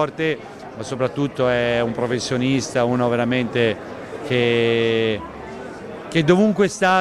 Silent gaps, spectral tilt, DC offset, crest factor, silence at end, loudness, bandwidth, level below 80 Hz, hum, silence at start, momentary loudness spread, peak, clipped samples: none; -5.5 dB/octave; under 0.1%; 18 dB; 0 s; -20 LUFS; 12.5 kHz; -52 dBFS; none; 0 s; 16 LU; -2 dBFS; under 0.1%